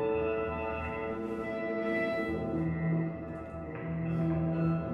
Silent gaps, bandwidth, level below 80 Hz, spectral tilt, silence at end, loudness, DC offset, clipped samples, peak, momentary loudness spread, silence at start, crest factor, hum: none; 5.6 kHz; -54 dBFS; -9.5 dB/octave; 0 s; -33 LUFS; under 0.1%; under 0.1%; -20 dBFS; 8 LU; 0 s; 12 dB; none